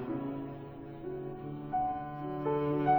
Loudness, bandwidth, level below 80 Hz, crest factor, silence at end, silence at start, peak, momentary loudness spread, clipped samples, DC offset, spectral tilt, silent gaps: -37 LUFS; over 20 kHz; -60 dBFS; 18 dB; 0 s; 0 s; -16 dBFS; 12 LU; under 0.1%; under 0.1%; -10.5 dB/octave; none